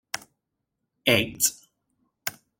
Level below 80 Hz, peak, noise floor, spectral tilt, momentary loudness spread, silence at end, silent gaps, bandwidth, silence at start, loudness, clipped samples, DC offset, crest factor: -62 dBFS; -4 dBFS; -81 dBFS; -2 dB/octave; 14 LU; 0.3 s; none; 17 kHz; 0.15 s; -24 LUFS; under 0.1%; under 0.1%; 26 dB